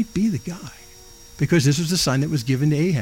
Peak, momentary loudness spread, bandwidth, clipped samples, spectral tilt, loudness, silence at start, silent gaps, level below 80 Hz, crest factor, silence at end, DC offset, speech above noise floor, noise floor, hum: -6 dBFS; 15 LU; 17 kHz; under 0.1%; -5.5 dB/octave; -21 LUFS; 0 s; none; -48 dBFS; 14 dB; 0 s; under 0.1%; 24 dB; -44 dBFS; none